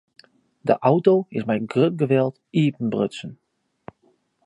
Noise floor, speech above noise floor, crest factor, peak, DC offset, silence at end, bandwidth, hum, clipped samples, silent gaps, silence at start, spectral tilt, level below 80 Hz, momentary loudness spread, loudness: -64 dBFS; 44 dB; 20 dB; -4 dBFS; under 0.1%; 1.1 s; 10.5 kHz; none; under 0.1%; none; 0.65 s; -8 dB/octave; -66 dBFS; 10 LU; -21 LUFS